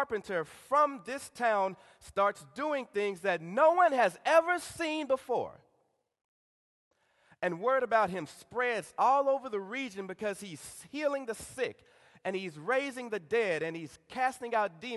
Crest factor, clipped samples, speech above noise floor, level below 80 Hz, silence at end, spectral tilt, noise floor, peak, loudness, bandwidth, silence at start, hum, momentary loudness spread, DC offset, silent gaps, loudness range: 20 dB; under 0.1%; 44 dB; -72 dBFS; 0 s; -4 dB/octave; -75 dBFS; -12 dBFS; -31 LUFS; 12.5 kHz; 0 s; none; 14 LU; under 0.1%; 6.24-6.91 s; 7 LU